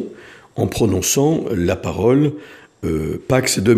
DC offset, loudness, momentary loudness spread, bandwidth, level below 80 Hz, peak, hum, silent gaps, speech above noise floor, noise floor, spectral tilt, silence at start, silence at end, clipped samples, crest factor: under 0.1%; -18 LUFS; 12 LU; 15.5 kHz; -40 dBFS; 0 dBFS; none; none; 23 dB; -40 dBFS; -5 dB/octave; 0 s; 0 s; under 0.1%; 18 dB